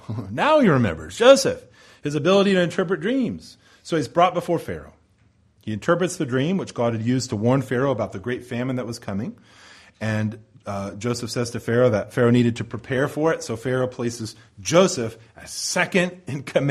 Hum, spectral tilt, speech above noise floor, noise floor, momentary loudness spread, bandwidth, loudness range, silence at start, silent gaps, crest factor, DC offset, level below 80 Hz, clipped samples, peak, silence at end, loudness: none; -5.5 dB/octave; 38 dB; -59 dBFS; 15 LU; 14.5 kHz; 6 LU; 0.1 s; none; 20 dB; under 0.1%; -54 dBFS; under 0.1%; -2 dBFS; 0 s; -22 LUFS